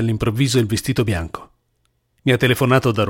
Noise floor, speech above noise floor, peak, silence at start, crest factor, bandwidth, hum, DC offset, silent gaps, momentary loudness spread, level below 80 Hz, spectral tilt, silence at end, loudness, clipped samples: -67 dBFS; 49 dB; -2 dBFS; 0 s; 18 dB; 17 kHz; none; under 0.1%; none; 9 LU; -42 dBFS; -5.5 dB/octave; 0 s; -18 LUFS; under 0.1%